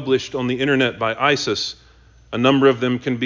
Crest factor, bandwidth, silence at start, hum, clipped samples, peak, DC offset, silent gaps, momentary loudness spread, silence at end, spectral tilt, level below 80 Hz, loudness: 18 dB; 7.6 kHz; 0 s; none; under 0.1%; -2 dBFS; under 0.1%; none; 9 LU; 0 s; -5 dB/octave; -52 dBFS; -19 LUFS